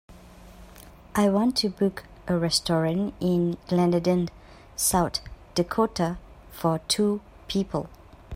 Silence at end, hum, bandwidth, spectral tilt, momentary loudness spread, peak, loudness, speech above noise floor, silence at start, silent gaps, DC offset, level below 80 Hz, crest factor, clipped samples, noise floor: 0 s; none; 16 kHz; -5 dB/octave; 11 LU; -8 dBFS; -25 LUFS; 23 dB; 0.1 s; none; under 0.1%; -48 dBFS; 18 dB; under 0.1%; -48 dBFS